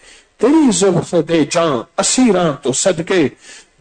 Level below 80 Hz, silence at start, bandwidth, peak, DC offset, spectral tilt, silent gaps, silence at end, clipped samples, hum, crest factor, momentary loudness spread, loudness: -48 dBFS; 0.4 s; 9.4 kHz; -4 dBFS; under 0.1%; -4 dB/octave; none; 0.25 s; under 0.1%; none; 12 dB; 5 LU; -14 LUFS